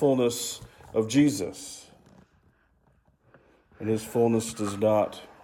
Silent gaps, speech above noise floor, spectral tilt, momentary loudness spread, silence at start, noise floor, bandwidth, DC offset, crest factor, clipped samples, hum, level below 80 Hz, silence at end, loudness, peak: none; 39 dB; -5.5 dB/octave; 16 LU; 0 s; -65 dBFS; 17.5 kHz; under 0.1%; 18 dB; under 0.1%; none; -62 dBFS; 0.15 s; -27 LUFS; -10 dBFS